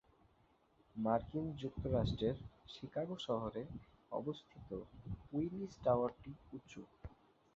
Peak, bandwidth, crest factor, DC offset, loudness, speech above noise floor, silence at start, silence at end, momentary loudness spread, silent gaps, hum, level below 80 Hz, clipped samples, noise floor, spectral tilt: -20 dBFS; 7.6 kHz; 22 dB; under 0.1%; -41 LUFS; 32 dB; 0.95 s; 0.4 s; 18 LU; none; none; -58 dBFS; under 0.1%; -73 dBFS; -7 dB/octave